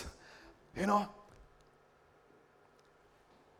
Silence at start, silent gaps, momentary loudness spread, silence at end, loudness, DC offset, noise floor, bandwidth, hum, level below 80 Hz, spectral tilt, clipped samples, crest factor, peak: 0 s; none; 26 LU; 2.15 s; -36 LUFS; under 0.1%; -66 dBFS; 15.5 kHz; none; -64 dBFS; -5.5 dB/octave; under 0.1%; 24 dB; -18 dBFS